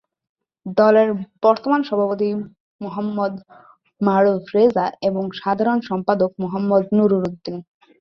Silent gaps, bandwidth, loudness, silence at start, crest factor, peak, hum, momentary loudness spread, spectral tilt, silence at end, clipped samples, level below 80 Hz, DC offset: 2.60-2.79 s; 6.2 kHz; -19 LUFS; 0.65 s; 18 dB; -2 dBFS; none; 14 LU; -8.5 dB/octave; 0.4 s; under 0.1%; -62 dBFS; under 0.1%